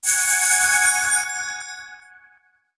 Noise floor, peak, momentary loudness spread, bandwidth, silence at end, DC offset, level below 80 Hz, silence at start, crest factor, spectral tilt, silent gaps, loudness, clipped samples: -59 dBFS; -6 dBFS; 18 LU; 11 kHz; 0.8 s; under 0.1%; -62 dBFS; 0 s; 16 dB; 3 dB/octave; none; -17 LUFS; under 0.1%